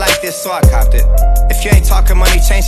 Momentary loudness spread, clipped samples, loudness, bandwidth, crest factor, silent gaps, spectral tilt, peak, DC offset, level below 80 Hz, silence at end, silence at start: 3 LU; 0.5%; -12 LUFS; 14 kHz; 8 dB; none; -4 dB/octave; 0 dBFS; under 0.1%; -10 dBFS; 0 s; 0 s